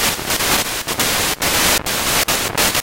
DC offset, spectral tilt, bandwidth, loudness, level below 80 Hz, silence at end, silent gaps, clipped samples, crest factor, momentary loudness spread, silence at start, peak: under 0.1%; -1 dB/octave; 17.5 kHz; -15 LUFS; -36 dBFS; 0 s; none; under 0.1%; 16 dB; 3 LU; 0 s; -2 dBFS